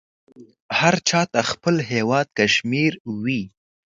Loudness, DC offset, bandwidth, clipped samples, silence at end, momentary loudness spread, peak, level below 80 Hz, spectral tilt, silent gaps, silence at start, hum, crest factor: -20 LUFS; under 0.1%; 9.2 kHz; under 0.1%; 0.5 s; 8 LU; 0 dBFS; -60 dBFS; -4 dB/octave; 0.60-0.69 s, 3.00-3.05 s; 0.4 s; none; 22 dB